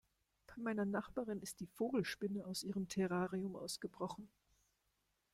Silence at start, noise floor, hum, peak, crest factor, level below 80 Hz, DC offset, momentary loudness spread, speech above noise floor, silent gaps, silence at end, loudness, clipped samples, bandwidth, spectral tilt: 0.5 s; -84 dBFS; 50 Hz at -75 dBFS; -26 dBFS; 18 dB; -74 dBFS; under 0.1%; 8 LU; 42 dB; none; 1.05 s; -43 LUFS; under 0.1%; 15.5 kHz; -5 dB/octave